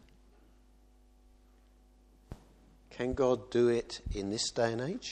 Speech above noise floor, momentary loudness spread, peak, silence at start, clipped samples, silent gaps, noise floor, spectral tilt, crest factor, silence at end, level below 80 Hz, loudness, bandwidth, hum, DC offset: 30 dB; 24 LU; -16 dBFS; 2.3 s; under 0.1%; none; -62 dBFS; -4.5 dB/octave; 20 dB; 0 s; -52 dBFS; -32 LUFS; 9.8 kHz; none; under 0.1%